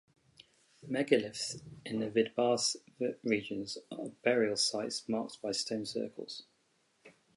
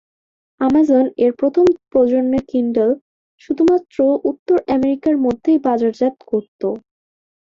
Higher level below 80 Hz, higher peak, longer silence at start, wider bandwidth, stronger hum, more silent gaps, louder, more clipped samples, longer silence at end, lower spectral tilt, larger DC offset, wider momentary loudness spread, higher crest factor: second, -76 dBFS vs -52 dBFS; second, -12 dBFS vs -4 dBFS; first, 0.85 s vs 0.6 s; first, 11.5 kHz vs 7.4 kHz; neither; second, none vs 3.01-3.38 s, 4.39-4.46 s, 6.48-6.59 s; second, -34 LUFS vs -17 LUFS; neither; second, 0.25 s vs 0.8 s; second, -3 dB/octave vs -7.5 dB/octave; neither; first, 12 LU vs 9 LU; first, 24 dB vs 12 dB